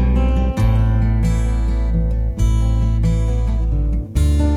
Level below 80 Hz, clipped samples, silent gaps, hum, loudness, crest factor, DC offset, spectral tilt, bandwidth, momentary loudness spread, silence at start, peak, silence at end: -16 dBFS; under 0.1%; none; none; -19 LUFS; 10 dB; under 0.1%; -8 dB/octave; 11 kHz; 3 LU; 0 s; -4 dBFS; 0 s